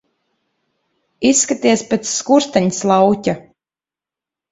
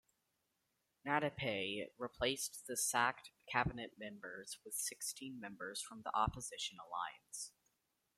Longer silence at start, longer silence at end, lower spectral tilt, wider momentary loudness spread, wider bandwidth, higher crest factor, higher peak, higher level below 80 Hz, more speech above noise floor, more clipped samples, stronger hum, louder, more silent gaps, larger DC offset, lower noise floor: first, 1.2 s vs 1.05 s; first, 1.1 s vs 0.7 s; first, -4 dB/octave vs -2.5 dB/octave; second, 6 LU vs 13 LU; second, 8.4 kHz vs 16 kHz; second, 18 dB vs 26 dB; first, 0 dBFS vs -18 dBFS; first, -56 dBFS vs -64 dBFS; first, over 75 dB vs 43 dB; neither; neither; first, -15 LUFS vs -41 LUFS; neither; neither; first, under -90 dBFS vs -85 dBFS